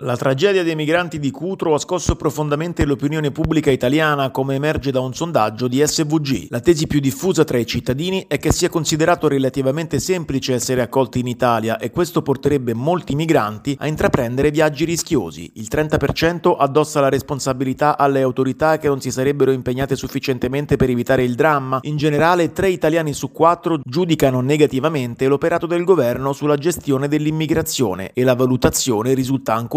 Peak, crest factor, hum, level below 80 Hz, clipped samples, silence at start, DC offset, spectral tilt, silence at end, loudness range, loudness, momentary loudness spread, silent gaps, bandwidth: 0 dBFS; 18 dB; none; -40 dBFS; under 0.1%; 0 s; under 0.1%; -5.5 dB/octave; 0 s; 2 LU; -18 LUFS; 5 LU; none; 16 kHz